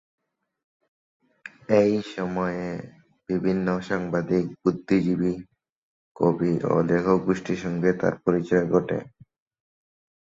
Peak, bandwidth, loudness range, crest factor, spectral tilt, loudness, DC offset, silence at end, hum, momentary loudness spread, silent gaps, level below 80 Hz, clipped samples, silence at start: -6 dBFS; 7.6 kHz; 3 LU; 20 dB; -8 dB/octave; -24 LUFS; under 0.1%; 1.15 s; none; 10 LU; 5.72-6.15 s; -56 dBFS; under 0.1%; 1.45 s